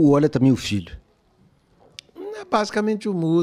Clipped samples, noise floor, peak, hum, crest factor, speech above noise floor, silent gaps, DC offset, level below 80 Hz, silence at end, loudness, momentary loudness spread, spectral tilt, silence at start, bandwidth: under 0.1%; -59 dBFS; -6 dBFS; none; 16 dB; 40 dB; none; under 0.1%; -52 dBFS; 0 s; -21 LUFS; 25 LU; -6.5 dB/octave; 0 s; 13.5 kHz